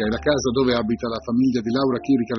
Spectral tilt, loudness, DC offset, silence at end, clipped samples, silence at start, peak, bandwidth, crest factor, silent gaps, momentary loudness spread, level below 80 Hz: -5 dB/octave; -21 LUFS; under 0.1%; 0 s; under 0.1%; 0 s; -6 dBFS; 6.4 kHz; 16 dB; none; 4 LU; -44 dBFS